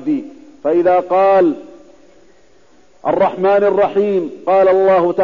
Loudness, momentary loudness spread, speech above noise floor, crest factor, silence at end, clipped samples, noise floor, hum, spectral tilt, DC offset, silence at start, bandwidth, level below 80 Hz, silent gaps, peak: -14 LUFS; 10 LU; 38 dB; 10 dB; 0 s; under 0.1%; -51 dBFS; none; -8 dB/octave; 0.4%; 0 s; 7 kHz; -56 dBFS; none; -4 dBFS